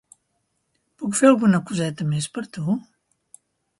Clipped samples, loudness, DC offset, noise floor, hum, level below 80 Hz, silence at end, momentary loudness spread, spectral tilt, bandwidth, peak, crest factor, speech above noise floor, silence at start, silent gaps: under 0.1%; -21 LUFS; under 0.1%; -73 dBFS; none; -64 dBFS; 1 s; 13 LU; -5.5 dB/octave; 11.5 kHz; -4 dBFS; 20 dB; 52 dB; 1 s; none